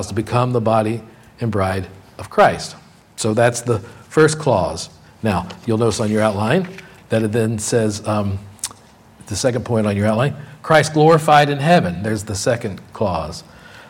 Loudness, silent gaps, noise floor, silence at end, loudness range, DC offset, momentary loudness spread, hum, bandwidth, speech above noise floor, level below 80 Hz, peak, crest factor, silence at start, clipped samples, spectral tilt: -18 LUFS; none; -45 dBFS; 0 s; 5 LU; under 0.1%; 15 LU; none; 16.5 kHz; 28 dB; -48 dBFS; 0 dBFS; 18 dB; 0 s; under 0.1%; -5.5 dB/octave